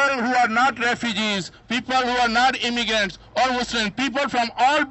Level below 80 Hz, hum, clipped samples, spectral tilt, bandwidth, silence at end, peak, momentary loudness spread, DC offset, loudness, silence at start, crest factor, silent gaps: -52 dBFS; none; under 0.1%; -3 dB/octave; 8.4 kHz; 0 s; -6 dBFS; 5 LU; under 0.1%; -21 LUFS; 0 s; 16 dB; none